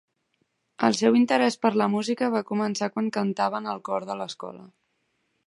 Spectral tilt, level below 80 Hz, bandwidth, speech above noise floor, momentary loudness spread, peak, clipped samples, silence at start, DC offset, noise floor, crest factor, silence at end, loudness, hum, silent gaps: -5 dB/octave; -76 dBFS; 11.5 kHz; 49 dB; 13 LU; -4 dBFS; under 0.1%; 0.8 s; under 0.1%; -74 dBFS; 22 dB; 0.8 s; -25 LUFS; none; none